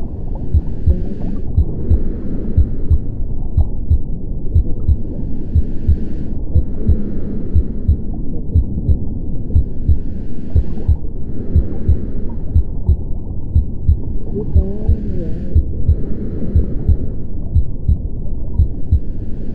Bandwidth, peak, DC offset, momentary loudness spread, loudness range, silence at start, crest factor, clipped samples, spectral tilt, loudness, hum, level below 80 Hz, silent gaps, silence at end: 1.8 kHz; 0 dBFS; under 0.1%; 8 LU; 1 LU; 0 s; 14 dB; under 0.1%; -12 dB/octave; -20 LUFS; none; -18 dBFS; none; 0 s